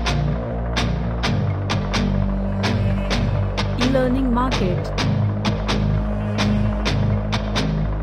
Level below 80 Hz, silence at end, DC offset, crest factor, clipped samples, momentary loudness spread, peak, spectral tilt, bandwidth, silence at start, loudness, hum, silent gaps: -26 dBFS; 0 s; under 0.1%; 14 dB; under 0.1%; 3 LU; -6 dBFS; -6.5 dB/octave; 10.5 kHz; 0 s; -21 LUFS; none; none